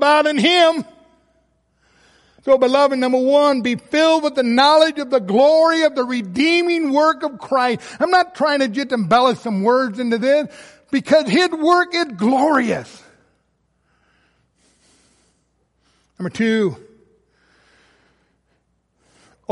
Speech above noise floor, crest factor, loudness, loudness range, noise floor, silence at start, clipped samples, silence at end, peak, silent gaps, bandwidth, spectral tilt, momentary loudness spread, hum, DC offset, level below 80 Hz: 50 dB; 16 dB; -16 LUFS; 11 LU; -66 dBFS; 0 s; under 0.1%; 2.75 s; -2 dBFS; none; 11.5 kHz; -4.5 dB/octave; 9 LU; none; under 0.1%; -62 dBFS